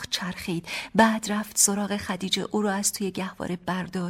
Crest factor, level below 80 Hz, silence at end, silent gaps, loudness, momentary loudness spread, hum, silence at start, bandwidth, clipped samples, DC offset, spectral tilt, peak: 20 dB; -58 dBFS; 0 s; none; -25 LUFS; 10 LU; none; 0 s; 16.5 kHz; under 0.1%; under 0.1%; -3 dB/octave; -6 dBFS